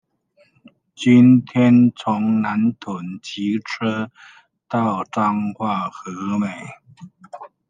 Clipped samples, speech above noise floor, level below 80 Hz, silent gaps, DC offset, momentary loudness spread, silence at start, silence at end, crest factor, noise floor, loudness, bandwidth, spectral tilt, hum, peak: under 0.1%; 41 dB; -68 dBFS; none; under 0.1%; 17 LU; 1 s; 0.25 s; 18 dB; -59 dBFS; -19 LUFS; 7.6 kHz; -7 dB/octave; none; -2 dBFS